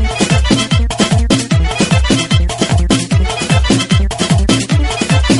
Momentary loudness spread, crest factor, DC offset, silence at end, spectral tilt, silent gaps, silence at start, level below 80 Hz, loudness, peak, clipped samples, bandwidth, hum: 3 LU; 12 dB; under 0.1%; 0 s; -5 dB/octave; none; 0 s; -18 dBFS; -13 LUFS; 0 dBFS; under 0.1%; 11.5 kHz; none